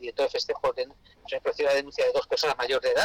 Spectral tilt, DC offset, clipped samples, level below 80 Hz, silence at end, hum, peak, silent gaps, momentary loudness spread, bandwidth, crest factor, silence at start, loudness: -2 dB/octave; under 0.1%; under 0.1%; -60 dBFS; 0 s; none; -18 dBFS; none; 8 LU; 16.5 kHz; 10 dB; 0 s; -27 LUFS